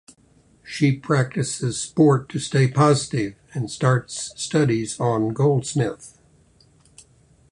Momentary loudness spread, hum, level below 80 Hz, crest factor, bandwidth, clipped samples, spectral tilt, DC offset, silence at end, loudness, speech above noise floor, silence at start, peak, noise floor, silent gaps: 11 LU; none; -56 dBFS; 18 dB; 11 kHz; under 0.1%; -6 dB/octave; under 0.1%; 1.4 s; -21 LUFS; 36 dB; 0.65 s; -4 dBFS; -57 dBFS; none